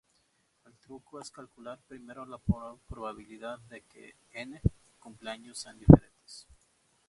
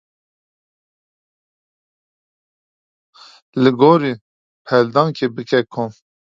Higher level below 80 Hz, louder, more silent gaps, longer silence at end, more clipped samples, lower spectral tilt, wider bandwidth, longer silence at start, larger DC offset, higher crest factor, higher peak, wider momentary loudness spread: first, -42 dBFS vs -66 dBFS; second, -26 LUFS vs -16 LUFS; second, none vs 4.21-4.65 s; first, 1.1 s vs 0.4 s; neither; about the same, -8 dB/octave vs -7.5 dB/octave; first, 11.5 kHz vs 7.6 kHz; second, 1.65 s vs 3.55 s; neither; first, 30 dB vs 20 dB; about the same, 0 dBFS vs 0 dBFS; first, 30 LU vs 14 LU